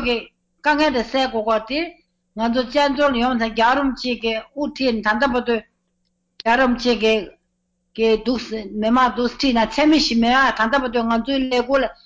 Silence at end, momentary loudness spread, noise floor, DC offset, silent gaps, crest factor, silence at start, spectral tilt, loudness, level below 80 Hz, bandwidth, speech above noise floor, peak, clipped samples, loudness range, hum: 0.1 s; 9 LU; -70 dBFS; under 0.1%; none; 12 dB; 0 s; -4 dB/octave; -19 LUFS; -44 dBFS; 8 kHz; 52 dB; -8 dBFS; under 0.1%; 3 LU; 60 Hz at -70 dBFS